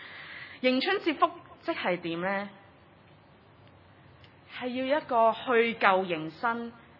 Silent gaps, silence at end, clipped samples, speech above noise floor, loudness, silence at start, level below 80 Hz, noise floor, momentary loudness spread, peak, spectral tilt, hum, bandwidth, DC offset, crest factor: none; 0.2 s; under 0.1%; 29 dB; -28 LUFS; 0 s; -76 dBFS; -57 dBFS; 15 LU; -6 dBFS; -7.5 dB/octave; none; 5.8 kHz; under 0.1%; 24 dB